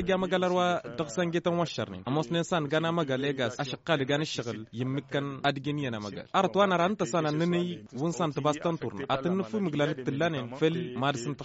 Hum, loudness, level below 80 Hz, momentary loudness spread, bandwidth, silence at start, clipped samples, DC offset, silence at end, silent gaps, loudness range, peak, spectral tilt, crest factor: none; -30 LUFS; -64 dBFS; 7 LU; 8 kHz; 0 s; under 0.1%; under 0.1%; 0 s; none; 2 LU; -12 dBFS; -4.5 dB/octave; 18 dB